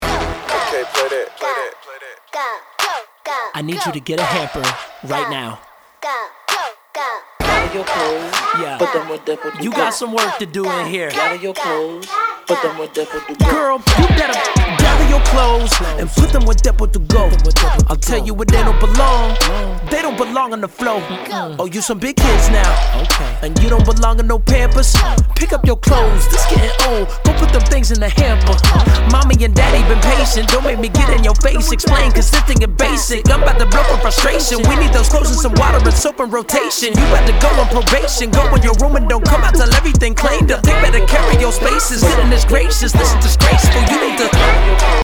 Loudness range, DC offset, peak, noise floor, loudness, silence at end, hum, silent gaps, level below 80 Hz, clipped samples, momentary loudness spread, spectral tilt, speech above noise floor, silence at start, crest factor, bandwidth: 8 LU; under 0.1%; 0 dBFS; -36 dBFS; -14 LUFS; 0 s; none; none; -14 dBFS; under 0.1%; 10 LU; -4.5 dB/octave; 24 dB; 0 s; 12 dB; 18.5 kHz